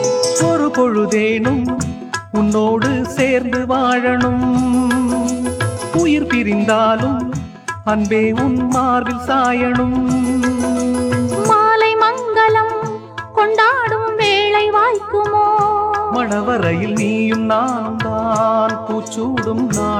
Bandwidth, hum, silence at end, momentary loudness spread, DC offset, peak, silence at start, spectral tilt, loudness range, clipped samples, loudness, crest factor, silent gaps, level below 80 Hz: 14.5 kHz; none; 0 s; 7 LU; under 0.1%; -2 dBFS; 0 s; -5 dB/octave; 2 LU; under 0.1%; -16 LUFS; 14 dB; none; -42 dBFS